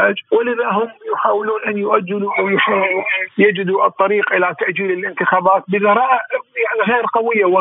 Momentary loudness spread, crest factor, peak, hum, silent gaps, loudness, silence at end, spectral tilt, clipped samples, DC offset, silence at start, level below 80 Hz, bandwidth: 5 LU; 16 dB; 0 dBFS; none; none; -16 LUFS; 0 s; -10 dB/octave; under 0.1%; under 0.1%; 0 s; -80 dBFS; 3.9 kHz